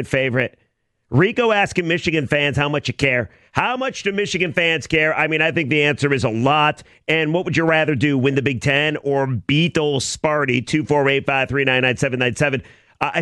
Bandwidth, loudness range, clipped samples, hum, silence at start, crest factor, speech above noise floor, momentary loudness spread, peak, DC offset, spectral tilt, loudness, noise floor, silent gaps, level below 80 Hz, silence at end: 12 kHz; 2 LU; under 0.1%; none; 0 s; 16 dB; 48 dB; 5 LU; -2 dBFS; under 0.1%; -5 dB/octave; -18 LUFS; -66 dBFS; none; -48 dBFS; 0 s